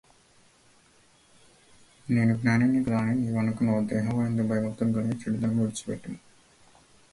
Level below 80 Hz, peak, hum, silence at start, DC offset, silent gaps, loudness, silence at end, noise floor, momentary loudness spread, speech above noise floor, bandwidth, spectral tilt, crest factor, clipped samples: -58 dBFS; -10 dBFS; none; 2.05 s; under 0.1%; none; -27 LUFS; 0.95 s; -60 dBFS; 12 LU; 35 dB; 11.5 kHz; -7.5 dB/octave; 18 dB; under 0.1%